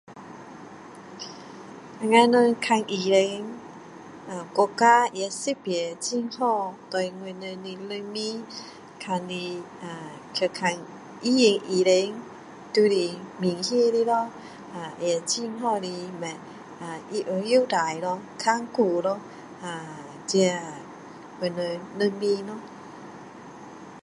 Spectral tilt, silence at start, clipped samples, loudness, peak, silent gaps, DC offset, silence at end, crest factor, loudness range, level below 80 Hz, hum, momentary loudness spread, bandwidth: -4 dB/octave; 0.1 s; under 0.1%; -25 LUFS; -4 dBFS; none; under 0.1%; 0.05 s; 22 dB; 8 LU; -74 dBFS; none; 22 LU; 11.5 kHz